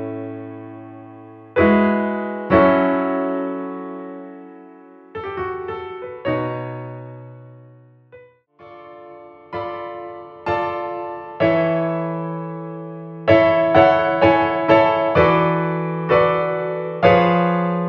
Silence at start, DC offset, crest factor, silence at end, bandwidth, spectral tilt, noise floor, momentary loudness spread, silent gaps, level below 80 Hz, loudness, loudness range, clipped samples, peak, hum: 0 s; under 0.1%; 20 dB; 0 s; 6.4 kHz; -9 dB/octave; -47 dBFS; 21 LU; none; -48 dBFS; -18 LUFS; 15 LU; under 0.1%; 0 dBFS; none